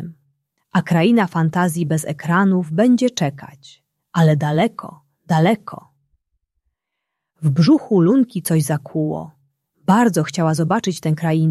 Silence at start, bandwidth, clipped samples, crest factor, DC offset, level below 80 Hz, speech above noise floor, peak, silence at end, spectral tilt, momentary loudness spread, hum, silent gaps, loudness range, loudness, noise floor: 0 s; 13.5 kHz; under 0.1%; 16 dB; under 0.1%; -60 dBFS; 63 dB; -2 dBFS; 0 s; -6.5 dB/octave; 10 LU; none; none; 3 LU; -18 LUFS; -79 dBFS